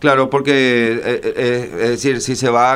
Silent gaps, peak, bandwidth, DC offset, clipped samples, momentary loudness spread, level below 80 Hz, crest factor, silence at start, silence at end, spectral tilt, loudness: none; 0 dBFS; 15.5 kHz; under 0.1%; under 0.1%; 5 LU; -50 dBFS; 14 dB; 0 s; 0 s; -4.5 dB/octave; -16 LUFS